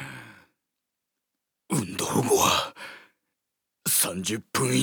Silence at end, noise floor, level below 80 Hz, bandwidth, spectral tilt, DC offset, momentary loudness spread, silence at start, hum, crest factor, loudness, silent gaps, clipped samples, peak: 0 s; -84 dBFS; -60 dBFS; over 20 kHz; -3 dB/octave; under 0.1%; 20 LU; 0 s; none; 20 dB; -25 LUFS; none; under 0.1%; -8 dBFS